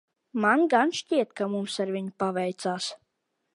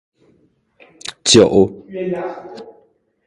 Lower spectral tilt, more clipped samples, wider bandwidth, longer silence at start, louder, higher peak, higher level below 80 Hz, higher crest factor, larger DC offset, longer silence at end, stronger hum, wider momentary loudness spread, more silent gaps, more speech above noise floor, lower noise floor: about the same, -4.5 dB/octave vs -4 dB/octave; neither; about the same, 11.5 kHz vs 11.5 kHz; second, 0.35 s vs 1.05 s; second, -27 LUFS vs -14 LUFS; second, -8 dBFS vs 0 dBFS; second, -78 dBFS vs -48 dBFS; about the same, 20 dB vs 18 dB; neither; about the same, 0.6 s vs 0.55 s; neither; second, 10 LU vs 24 LU; neither; first, 53 dB vs 43 dB; first, -79 dBFS vs -58 dBFS